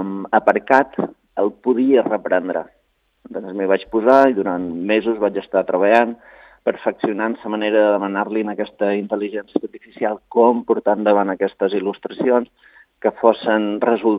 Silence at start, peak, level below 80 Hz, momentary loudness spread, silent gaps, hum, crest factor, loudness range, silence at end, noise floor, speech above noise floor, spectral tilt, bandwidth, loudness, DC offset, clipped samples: 0 s; 0 dBFS; -62 dBFS; 10 LU; none; none; 18 dB; 3 LU; 0 s; -51 dBFS; 34 dB; -7.5 dB/octave; 6.8 kHz; -18 LUFS; under 0.1%; under 0.1%